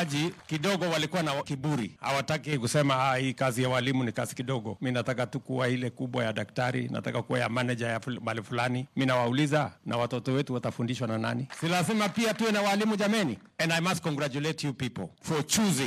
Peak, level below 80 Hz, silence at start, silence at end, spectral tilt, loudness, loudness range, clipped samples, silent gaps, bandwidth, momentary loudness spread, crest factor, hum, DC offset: -12 dBFS; -68 dBFS; 0 s; 0 s; -5 dB/octave; -29 LUFS; 3 LU; under 0.1%; none; 15.5 kHz; 6 LU; 16 dB; none; under 0.1%